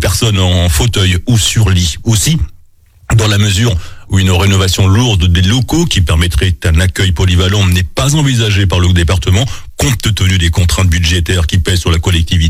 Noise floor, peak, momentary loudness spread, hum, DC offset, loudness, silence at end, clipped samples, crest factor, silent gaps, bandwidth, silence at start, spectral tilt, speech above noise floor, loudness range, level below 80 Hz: -42 dBFS; 0 dBFS; 3 LU; none; under 0.1%; -11 LUFS; 0 s; under 0.1%; 10 dB; none; 16 kHz; 0 s; -4.5 dB/octave; 32 dB; 1 LU; -20 dBFS